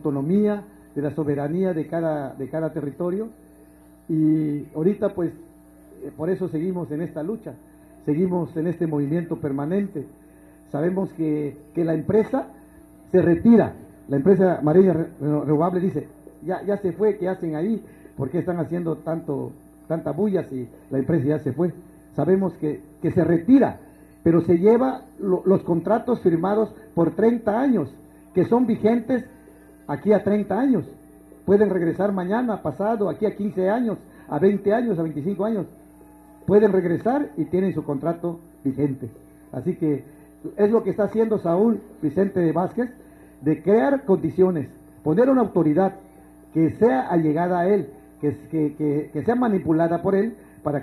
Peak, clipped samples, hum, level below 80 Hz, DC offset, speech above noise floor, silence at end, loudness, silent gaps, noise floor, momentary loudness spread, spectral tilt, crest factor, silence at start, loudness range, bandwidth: -4 dBFS; under 0.1%; none; -56 dBFS; under 0.1%; 29 dB; 0 s; -22 LUFS; none; -50 dBFS; 12 LU; -9.5 dB/octave; 18 dB; 0.05 s; 6 LU; 12.5 kHz